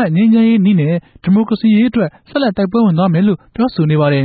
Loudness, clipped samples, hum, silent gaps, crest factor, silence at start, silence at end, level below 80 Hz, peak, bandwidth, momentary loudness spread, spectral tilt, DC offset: -13 LUFS; under 0.1%; none; none; 8 dB; 0 s; 0 s; -48 dBFS; -4 dBFS; 4.8 kHz; 7 LU; -13.5 dB/octave; under 0.1%